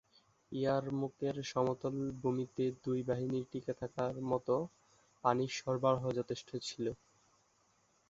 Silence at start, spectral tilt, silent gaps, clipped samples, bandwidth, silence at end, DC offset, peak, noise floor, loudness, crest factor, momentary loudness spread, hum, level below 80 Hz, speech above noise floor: 0.5 s; -6 dB/octave; none; under 0.1%; 7.6 kHz; 1.15 s; under 0.1%; -16 dBFS; -73 dBFS; -37 LUFS; 22 dB; 8 LU; none; -70 dBFS; 37 dB